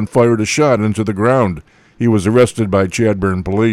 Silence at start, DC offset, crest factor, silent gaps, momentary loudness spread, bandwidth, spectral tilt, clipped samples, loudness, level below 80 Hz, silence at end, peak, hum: 0 s; under 0.1%; 12 dB; none; 5 LU; 14 kHz; -6 dB/octave; under 0.1%; -14 LUFS; -42 dBFS; 0 s; -2 dBFS; none